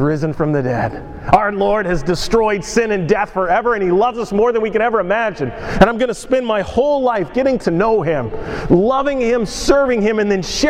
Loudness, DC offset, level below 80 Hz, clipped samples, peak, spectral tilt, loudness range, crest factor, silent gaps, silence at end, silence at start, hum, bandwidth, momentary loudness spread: -16 LUFS; under 0.1%; -34 dBFS; under 0.1%; 0 dBFS; -5.5 dB/octave; 1 LU; 16 dB; none; 0 s; 0 s; none; 14.5 kHz; 6 LU